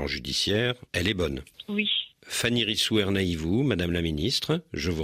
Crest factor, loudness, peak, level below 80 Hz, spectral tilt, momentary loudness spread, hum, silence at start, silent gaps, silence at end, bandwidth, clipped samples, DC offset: 18 dB; -26 LUFS; -8 dBFS; -48 dBFS; -4.5 dB/octave; 6 LU; none; 0 s; none; 0 s; 15.5 kHz; under 0.1%; under 0.1%